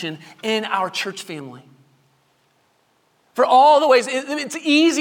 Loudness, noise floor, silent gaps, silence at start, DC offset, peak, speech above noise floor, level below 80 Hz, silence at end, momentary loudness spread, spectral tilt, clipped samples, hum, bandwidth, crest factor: -17 LUFS; -63 dBFS; none; 0 s; under 0.1%; -2 dBFS; 45 dB; -74 dBFS; 0 s; 19 LU; -3 dB/octave; under 0.1%; none; 18 kHz; 18 dB